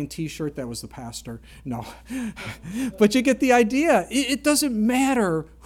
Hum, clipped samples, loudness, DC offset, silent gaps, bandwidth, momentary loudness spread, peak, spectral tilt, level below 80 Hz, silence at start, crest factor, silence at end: none; under 0.1%; -22 LUFS; under 0.1%; none; 17.5 kHz; 17 LU; -4 dBFS; -4 dB/octave; -48 dBFS; 0 s; 18 dB; 0.2 s